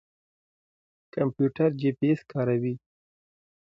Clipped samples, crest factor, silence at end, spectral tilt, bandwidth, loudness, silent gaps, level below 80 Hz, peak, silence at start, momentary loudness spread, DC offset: under 0.1%; 18 dB; 0.9 s; -10 dB/octave; 7.2 kHz; -27 LUFS; none; -70 dBFS; -12 dBFS; 1.15 s; 9 LU; under 0.1%